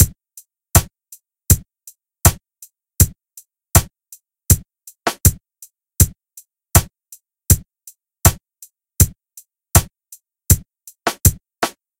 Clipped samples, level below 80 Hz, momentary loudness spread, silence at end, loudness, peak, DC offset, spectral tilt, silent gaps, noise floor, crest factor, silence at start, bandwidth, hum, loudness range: under 0.1%; -28 dBFS; 9 LU; 0.3 s; -17 LUFS; 0 dBFS; under 0.1%; -4 dB/octave; none; -48 dBFS; 20 dB; 0 s; over 20 kHz; none; 0 LU